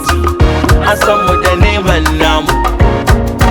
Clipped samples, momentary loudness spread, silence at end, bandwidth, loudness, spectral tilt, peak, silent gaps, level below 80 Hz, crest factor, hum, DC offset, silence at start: 0.2%; 2 LU; 0 s; over 20 kHz; -10 LUFS; -5.5 dB/octave; 0 dBFS; none; -16 dBFS; 10 dB; none; under 0.1%; 0 s